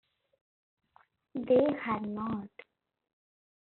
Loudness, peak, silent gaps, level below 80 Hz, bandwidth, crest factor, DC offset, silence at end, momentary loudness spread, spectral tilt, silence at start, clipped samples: -31 LUFS; -16 dBFS; none; -70 dBFS; 4.2 kHz; 20 dB; under 0.1%; 1.25 s; 16 LU; -6 dB/octave; 1.35 s; under 0.1%